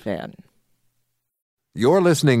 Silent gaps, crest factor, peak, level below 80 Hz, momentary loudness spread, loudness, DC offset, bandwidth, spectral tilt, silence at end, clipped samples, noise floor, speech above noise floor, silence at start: 1.42-1.57 s; 18 dB; -4 dBFS; -62 dBFS; 22 LU; -18 LUFS; under 0.1%; 15.5 kHz; -6 dB/octave; 0 s; under 0.1%; -74 dBFS; 55 dB; 0.05 s